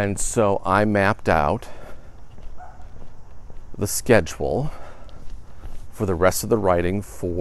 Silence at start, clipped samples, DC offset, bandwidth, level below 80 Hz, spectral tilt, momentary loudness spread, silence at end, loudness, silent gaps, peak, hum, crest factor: 0 s; under 0.1%; under 0.1%; 13.5 kHz; -38 dBFS; -5 dB/octave; 24 LU; 0 s; -21 LUFS; none; -2 dBFS; none; 20 dB